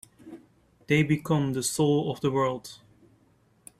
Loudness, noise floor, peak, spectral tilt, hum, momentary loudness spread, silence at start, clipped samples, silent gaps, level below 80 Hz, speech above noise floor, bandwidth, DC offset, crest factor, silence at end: -26 LUFS; -64 dBFS; -10 dBFS; -5.5 dB/octave; none; 23 LU; 0.25 s; under 0.1%; none; -62 dBFS; 38 dB; 14.5 kHz; under 0.1%; 18 dB; 1.05 s